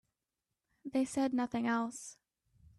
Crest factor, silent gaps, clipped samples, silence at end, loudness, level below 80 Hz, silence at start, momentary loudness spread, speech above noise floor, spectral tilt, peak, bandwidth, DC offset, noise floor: 16 dB; none; under 0.1%; 0.65 s; -35 LUFS; -72 dBFS; 0.85 s; 16 LU; 55 dB; -4.5 dB/octave; -22 dBFS; 12.5 kHz; under 0.1%; -89 dBFS